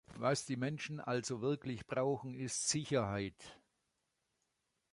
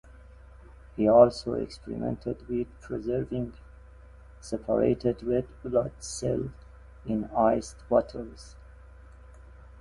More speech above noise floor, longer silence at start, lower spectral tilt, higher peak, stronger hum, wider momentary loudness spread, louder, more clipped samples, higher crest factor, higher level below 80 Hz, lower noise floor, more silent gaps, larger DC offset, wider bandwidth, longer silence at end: first, 46 dB vs 23 dB; second, 0.1 s vs 0.95 s; second, -4.5 dB/octave vs -6.5 dB/octave; second, -20 dBFS vs -6 dBFS; neither; second, 7 LU vs 17 LU; second, -38 LUFS vs -28 LUFS; neither; about the same, 20 dB vs 24 dB; second, -68 dBFS vs -48 dBFS; first, -85 dBFS vs -50 dBFS; neither; neither; about the same, 11.5 kHz vs 11.5 kHz; first, 1.35 s vs 0.15 s